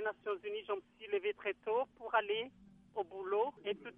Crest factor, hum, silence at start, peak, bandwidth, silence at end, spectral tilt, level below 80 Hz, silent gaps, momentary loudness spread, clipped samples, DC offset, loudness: 20 dB; none; 0 s; -18 dBFS; 3.8 kHz; 0.05 s; -6 dB/octave; -78 dBFS; none; 8 LU; under 0.1%; under 0.1%; -39 LUFS